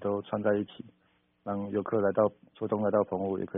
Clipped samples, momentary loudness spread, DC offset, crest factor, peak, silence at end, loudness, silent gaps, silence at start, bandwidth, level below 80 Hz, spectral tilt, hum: under 0.1%; 14 LU; under 0.1%; 20 dB; -12 dBFS; 0 s; -30 LUFS; none; 0 s; 3.8 kHz; -70 dBFS; -4.5 dB/octave; none